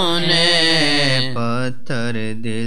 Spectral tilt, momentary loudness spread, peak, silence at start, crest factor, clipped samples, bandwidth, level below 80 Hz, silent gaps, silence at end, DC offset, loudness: -4 dB/octave; 12 LU; -4 dBFS; 0 s; 16 dB; under 0.1%; 13.5 kHz; -56 dBFS; none; 0 s; 9%; -16 LUFS